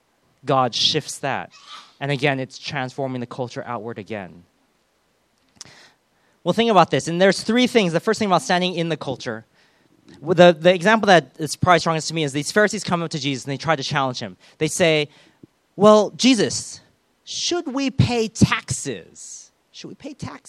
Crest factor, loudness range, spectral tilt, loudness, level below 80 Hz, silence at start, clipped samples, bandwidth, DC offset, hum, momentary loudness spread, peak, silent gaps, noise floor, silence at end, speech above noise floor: 20 dB; 9 LU; -4.5 dB/octave; -19 LUFS; -52 dBFS; 0.45 s; under 0.1%; 14 kHz; under 0.1%; none; 20 LU; 0 dBFS; none; -65 dBFS; 0.1 s; 45 dB